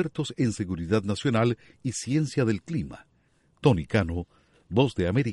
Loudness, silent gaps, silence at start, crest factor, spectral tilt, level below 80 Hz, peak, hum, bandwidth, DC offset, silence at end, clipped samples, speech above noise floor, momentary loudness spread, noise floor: -27 LUFS; none; 0 s; 20 dB; -6.5 dB/octave; -50 dBFS; -6 dBFS; none; 11.5 kHz; under 0.1%; 0 s; under 0.1%; 40 dB; 9 LU; -65 dBFS